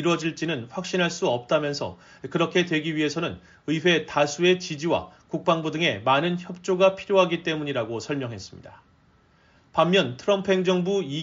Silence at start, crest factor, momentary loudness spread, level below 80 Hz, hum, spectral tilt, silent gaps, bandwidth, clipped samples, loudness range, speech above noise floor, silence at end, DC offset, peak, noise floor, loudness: 0 s; 18 dB; 10 LU; -62 dBFS; none; -4 dB/octave; none; 7.8 kHz; under 0.1%; 3 LU; 35 dB; 0 s; under 0.1%; -6 dBFS; -59 dBFS; -24 LUFS